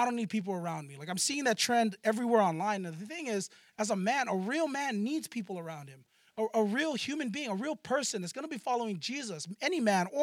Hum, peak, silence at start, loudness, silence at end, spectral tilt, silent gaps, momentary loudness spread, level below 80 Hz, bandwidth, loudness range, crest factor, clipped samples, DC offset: none; -14 dBFS; 0 s; -32 LUFS; 0 s; -4 dB/octave; none; 11 LU; -86 dBFS; 16.5 kHz; 3 LU; 20 dB; under 0.1%; under 0.1%